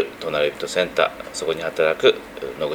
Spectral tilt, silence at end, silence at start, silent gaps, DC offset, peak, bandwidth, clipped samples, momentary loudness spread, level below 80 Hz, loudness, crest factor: -3 dB/octave; 0 s; 0 s; none; under 0.1%; -2 dBFS; over 20 kHz; under 0.1%; 10 LU; -54 dBFS; -21 LUFS; 20 dB